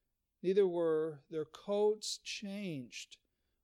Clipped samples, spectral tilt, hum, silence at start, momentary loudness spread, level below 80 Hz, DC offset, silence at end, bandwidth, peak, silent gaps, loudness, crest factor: under 0.1%; -4.5 dB/octave; none; 0.45 s; 13 LU; -82 dBFS; under 0.1%; 0.6 s; 13.5 kHz; -20 dBFS; none; -36 LUFS; 18 dB